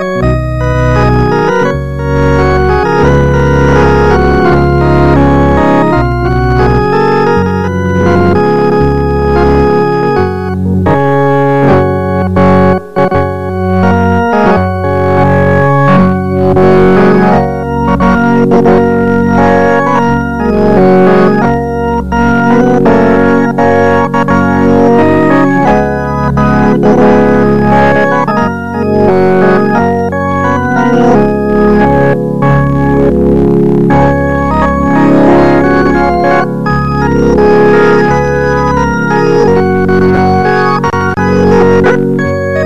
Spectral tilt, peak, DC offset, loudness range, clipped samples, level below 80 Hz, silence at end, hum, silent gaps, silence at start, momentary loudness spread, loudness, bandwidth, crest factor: -8.5 dB/octave; 0 dBFS; 6%; 2 LU; under 0.1%; -22 dBFS; 0 s; none; none; 0 s; 5 LU; -8 LUFS; 8.8 kHz; 8 dB